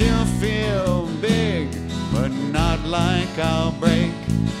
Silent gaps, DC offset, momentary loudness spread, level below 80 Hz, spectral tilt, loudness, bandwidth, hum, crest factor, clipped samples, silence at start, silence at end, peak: none; under 0.1%; 4 LU; -30 dBFS; -6 dB/octave; -21 LUFS; 14.5 kHz; none; 18 dB; under 0.1%; 0 s; 0 s; -2 dBFS